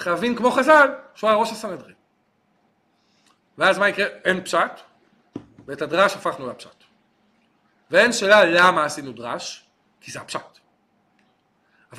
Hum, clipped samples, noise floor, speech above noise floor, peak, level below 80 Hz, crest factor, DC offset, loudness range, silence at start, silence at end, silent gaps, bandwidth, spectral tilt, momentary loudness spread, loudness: none; under 0.1%; -66 dBFS; 46 dB; -2 dBFS; -64 dBFS; 20 dB; under 0.1%; 6 LU; 0 s; 0 s; none; 15 kHz; -3.5 dB/octave; 23 LU; -19 LUFS